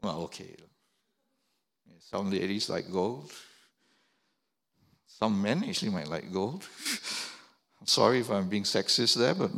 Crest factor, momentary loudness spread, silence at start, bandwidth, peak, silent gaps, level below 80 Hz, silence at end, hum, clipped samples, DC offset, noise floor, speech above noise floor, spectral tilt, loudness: 22 dB; 17 LU; 0.05 s; 16.5 kHz; -10 dBFS; none; -72 dBFS; 0 s; none; under 0.1%; under 0.1%; -80 dBFS; 50 dB; -4 dB/octave; -29 LUFS